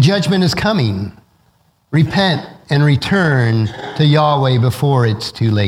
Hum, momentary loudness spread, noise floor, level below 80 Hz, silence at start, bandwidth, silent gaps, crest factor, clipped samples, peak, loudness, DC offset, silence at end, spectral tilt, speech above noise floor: none; 7 LU; -57 dBFS; -44 dBFS; 0 s; 14 kHz; none; 14 dB; under 0.1%; 0 dBFS; -15 LUFS; under 0.1%; 0 s; -6.5 dB/octave; 43 dB